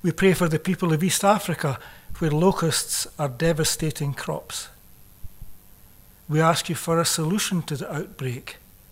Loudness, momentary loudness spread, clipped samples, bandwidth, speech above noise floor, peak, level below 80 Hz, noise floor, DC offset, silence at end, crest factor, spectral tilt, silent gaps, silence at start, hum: -23 LUFS; 12 LU; under 0.1%; 16 kHz; 27 dB; -6 dBFS; -46 dBFS; -50 dBFS; under 0.1%; 0.35 s; 20 dB; -4.5 dB/octave; none; 0.05 s; none